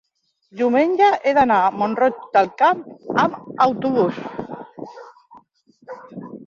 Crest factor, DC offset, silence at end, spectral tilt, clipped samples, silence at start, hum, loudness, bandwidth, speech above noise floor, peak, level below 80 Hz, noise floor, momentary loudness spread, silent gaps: 18 dB; under 0.1%; 0.05 s; -6.5 dB/octave; under 0.1%; 0.55 s; none; -18 LUFS; 7.2 kHz; 38 dB; -2 dBFS; -60 dBFS; -56 dBFS; 21 LU; none